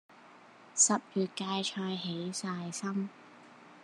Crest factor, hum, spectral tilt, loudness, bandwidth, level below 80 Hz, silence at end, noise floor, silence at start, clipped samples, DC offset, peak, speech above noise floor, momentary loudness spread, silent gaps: 22 dB; none; -3 dB/octave; -32 LUFS; 12 kHz; under -90 dBFS; 0 s; -56 dBFS; 0.1 s; under 0.1%; under 0.1%; -14 dBFS; 23 dB; 12 LU; none